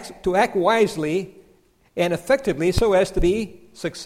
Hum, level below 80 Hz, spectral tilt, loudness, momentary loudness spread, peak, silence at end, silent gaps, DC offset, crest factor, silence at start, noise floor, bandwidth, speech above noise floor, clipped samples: none; -34 dBFS; -5.5 dB/octave; -21 LUFS; 13 LU; -6 dBFS; 0 s; none; under 0.1%; 16 dB; 0 s; -57 dBFS; 16 kHz; 37 dB; under 0.1%